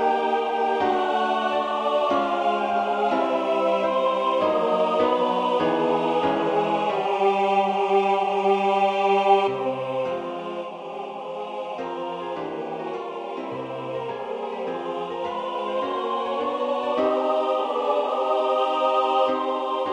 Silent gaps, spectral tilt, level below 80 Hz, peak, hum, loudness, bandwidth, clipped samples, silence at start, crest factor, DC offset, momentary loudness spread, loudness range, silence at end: none; -5.5 dB/octave; -68 dBFS; -6 dBFS; none; -24 LUFS; 10 kHz; under 0.1%; 0 s; 18 dB; under 0.1%; 10 LU; 9 LU; 0 s